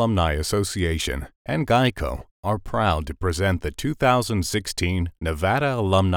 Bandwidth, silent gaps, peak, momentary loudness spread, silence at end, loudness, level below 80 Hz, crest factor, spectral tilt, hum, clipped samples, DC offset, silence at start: 18 kHz; 1.35-1.45 s, 2.31-2.43 s; -6 dBFS; 8 LU; 0 s; -23 LUFS; -36 dBFS; 18 dB; -5.5 dB/octave; none; under 0.1%; under 0.1%; 0 s